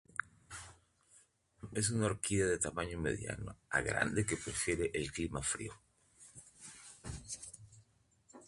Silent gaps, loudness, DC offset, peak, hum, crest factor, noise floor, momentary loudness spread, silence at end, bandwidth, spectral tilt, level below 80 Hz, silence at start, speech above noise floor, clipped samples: none; -37 LUFS; under 0.1%; -16 dBFS; none; 24 dB; -71 dBFS; 19 LU; 0 s; 11.5 kHz; -4 dB/octave; -56 dBFS; 0.2 s; 34 dB; under 0.1%